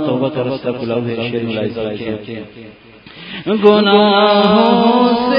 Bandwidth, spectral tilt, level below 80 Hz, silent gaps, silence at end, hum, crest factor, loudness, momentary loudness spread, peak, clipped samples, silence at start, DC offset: 5.4 kHz; -8.5 dB/octave; -52 dBFS; none; 0 s; none; 14 dB; -14 LUFS; 17 LU; 0 dBFS; under 0.1%; 0 s; under 0.1%